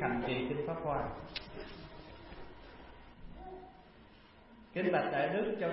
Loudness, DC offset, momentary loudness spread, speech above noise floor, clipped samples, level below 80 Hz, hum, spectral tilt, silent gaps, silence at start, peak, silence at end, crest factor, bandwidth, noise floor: -36 LUFS; under 0.1%; 23 LU; 24 dB; under 0.1%; -56 dBFS; none; -4.5 dB/octave; none; 0 s; -18 dBFS; 0 s; 20 dB; 5.6 kHz; -59 dBFS